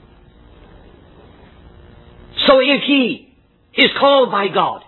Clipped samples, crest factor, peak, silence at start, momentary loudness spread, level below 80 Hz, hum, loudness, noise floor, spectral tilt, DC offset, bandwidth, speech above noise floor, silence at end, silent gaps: under 0.1%; 18 dB; 0 dBFS; 2.35 s; 13 LU; -48 dBFS; none; -14 LUFS; -46 dBFS; -6.5 dB/octave; under 0.1%; 4.3 kHz; 32 dB; 0.1 s; none